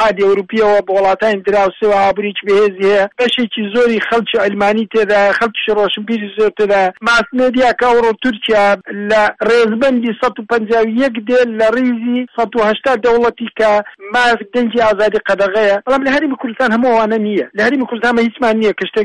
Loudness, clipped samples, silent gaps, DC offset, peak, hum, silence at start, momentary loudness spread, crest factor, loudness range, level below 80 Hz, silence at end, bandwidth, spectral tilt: -13 LUFS; under 0.1%; none; 0.2%; -4 dBFS; none; 0 s; 5 LU; 10 dB; 1 LU; -48 dBFS; 0 s; 11 kHz; -5 dB/octave